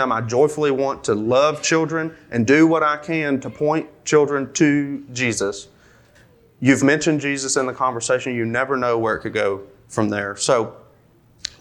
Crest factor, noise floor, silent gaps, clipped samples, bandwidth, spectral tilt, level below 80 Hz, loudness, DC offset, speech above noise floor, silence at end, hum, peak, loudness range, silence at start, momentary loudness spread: 20 dB; -54 dBFS; none; under 0.1%; 12.5 kHz; -4.5 dB/octave; -58 dBFS; -19 LUFS; under 0.1%; 34 dB; 0.15 s; none; 0 dBFS; 3 LU; 0 s; 8 LU